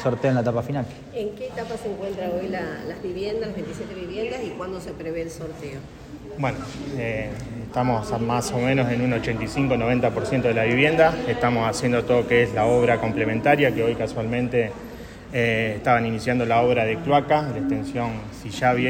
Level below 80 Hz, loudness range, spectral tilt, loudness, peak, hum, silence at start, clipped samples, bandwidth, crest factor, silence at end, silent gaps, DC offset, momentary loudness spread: -46 dBFS; 10 LU; -6 dB/octave; -23 LUFS; -4 dBFS; none; 0 s; under 0.1%; 16 kHz; 18 dB; 0 s; none; under 0.1%; 13 LU